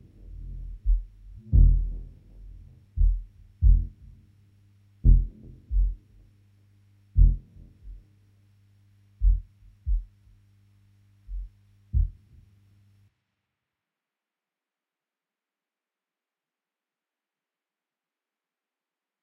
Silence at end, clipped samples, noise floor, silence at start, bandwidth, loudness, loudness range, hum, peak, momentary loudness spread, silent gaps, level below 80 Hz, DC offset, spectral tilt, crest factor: 7.1 s; under 0.1%; under -90 dBFS; 0.3 s; 0.6 kHz; -27 LUFS; 11 LU; none; -6 dBFS; 26 LU; none; -28 dBFS; under 0.1%; -11.5 dB/octave; 22 dB